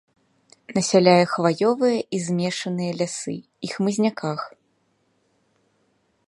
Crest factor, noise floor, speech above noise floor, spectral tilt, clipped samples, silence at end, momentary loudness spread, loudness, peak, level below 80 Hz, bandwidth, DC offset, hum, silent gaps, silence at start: 22 dB; -67 dBFS; 46 dB; -5 dB/octave; under 0.1%; 1.8 s; 16 LU; -22 LUFS; 0 dBFS; -68 dBFS; 11.5 kHz; under 0.1%; none; none; 0.7 s